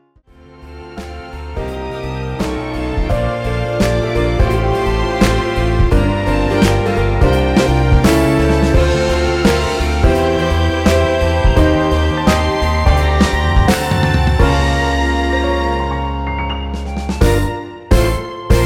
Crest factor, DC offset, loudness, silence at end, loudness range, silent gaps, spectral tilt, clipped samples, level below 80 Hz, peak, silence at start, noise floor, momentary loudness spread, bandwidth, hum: 14 dB; under 0.1%; -15 LUFS; 0 s; 5 LU; none; -6 dB/octave; under 0.1%; -18 dBFS; 0 dBFS; 0.6 s; -45 dBFS; 10 LU; 16.5 kHz; none